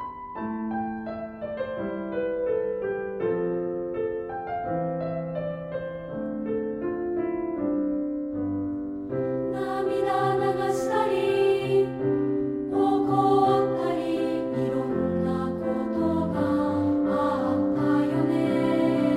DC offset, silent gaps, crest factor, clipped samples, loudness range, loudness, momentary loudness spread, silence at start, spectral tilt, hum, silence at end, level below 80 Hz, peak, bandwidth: under 0.1%; none; 16 dB; under 0.1%; 6 LU; -26 LUFS; 9 LU; 0 s; -7.5 dB/octave; none; 0 s; -54 dBFS; -10 dBFS; 12 kHz